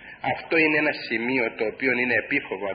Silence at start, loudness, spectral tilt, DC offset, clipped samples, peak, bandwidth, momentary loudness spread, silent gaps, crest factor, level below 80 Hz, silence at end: 0 s; -23 LUFS; -9.5 dB/octave; under 0.1%; under 0.1%; -8 dBFS; 5.2 kHz; 7 LU; none; 16 dB; -62 dBFS; 0 s